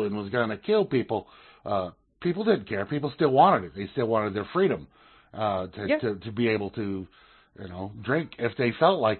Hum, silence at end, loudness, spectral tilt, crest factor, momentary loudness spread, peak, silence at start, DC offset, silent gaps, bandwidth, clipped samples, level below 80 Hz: none; 0 s; -27 LUFS; -10.5 dB/octave; 20 dB; 14 LU; -6 dBFS; 0 s; under 0.1%; none; 4.4 kHz; under 0.1%; -62 dBFS